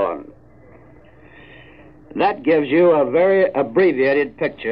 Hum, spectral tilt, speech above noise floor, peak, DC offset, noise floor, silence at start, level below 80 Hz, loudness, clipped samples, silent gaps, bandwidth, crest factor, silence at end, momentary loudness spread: none; -9.5 dB/octave; 30 dB; -6 dBFS; 0.2%; -47 dBFS; 0 s; -56 dBFS; -17 LUFS; under 0.1%; none; 5.4 kHz; 14 dB; 0 s; 9 LU